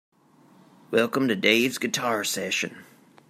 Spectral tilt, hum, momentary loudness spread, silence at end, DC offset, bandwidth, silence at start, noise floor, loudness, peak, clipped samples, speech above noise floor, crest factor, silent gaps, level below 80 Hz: -3 dB/octave; none; 7 LU; 0.45 s; under 0.1%; 16 kHz; 0.9 s; -56 dBFS; -24 LUFS; -4 dBFS; under 0.1%; 32 dB; 22 dB; none; -72 dBFS